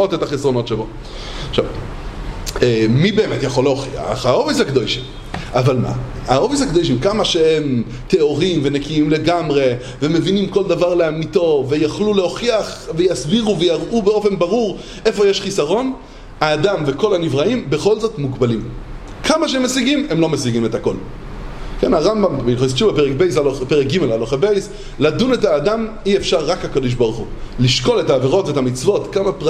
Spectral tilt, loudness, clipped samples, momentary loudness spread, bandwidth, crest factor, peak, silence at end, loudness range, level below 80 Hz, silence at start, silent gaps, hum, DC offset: -5.5 dB/octave; -17 LUFS; under 0.1%; 9 LU; 13.5 kHz; 16 dB; 0 dBFS; 0 s; 2 LU; -34 dBFS; 0 s; none; none; under 0.1%